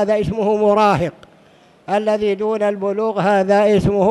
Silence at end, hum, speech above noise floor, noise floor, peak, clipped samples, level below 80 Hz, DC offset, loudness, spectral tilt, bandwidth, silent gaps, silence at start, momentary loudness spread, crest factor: 0 s; none; 34 dB; -49 dBFS; -4 dBFS; under 0.1%; -44 dBFS; under 0.1%; -17 LUFS; -7 dB/octave; 11.5 kHz; none; 0 s; 6 LU; 12 dB